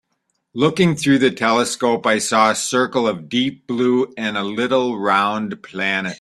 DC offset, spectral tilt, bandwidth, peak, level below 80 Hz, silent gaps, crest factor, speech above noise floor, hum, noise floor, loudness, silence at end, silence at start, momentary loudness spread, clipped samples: under 0.1%; -4 dB/octave; 13.5 kHz; -2 dBFS; -60 dBFS; none; 16 dB; 53 dB; none; -71 dBFS; -18 LUFS; 0.05 s; 0.55 s; 7 LU; under 0.1%